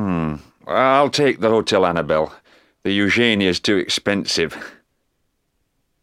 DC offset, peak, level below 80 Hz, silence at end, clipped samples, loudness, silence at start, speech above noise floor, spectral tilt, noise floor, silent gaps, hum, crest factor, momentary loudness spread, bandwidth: under 0.1%; 0 dBFS; -50 dBFS; 1.3 s; under 0.1%; -18 LUFS; 0 s; 52 dB; -4.5 dB/octave; -69 dBFS; none; none; 20 dB; 12 LU; 15 kHz